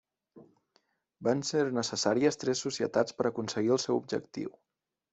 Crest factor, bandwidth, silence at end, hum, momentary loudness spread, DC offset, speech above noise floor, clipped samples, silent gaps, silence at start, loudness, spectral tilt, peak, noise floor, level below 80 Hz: 18 dB; 8.2 kHz; 0.65 s; none; 8 LU; under 0.1%; 43 dB; under 0.1%; none; 0.35 s; -31 LUFS; -4.5 dB/octave; -12 dBFS; -73 dBFS; -74 dBFS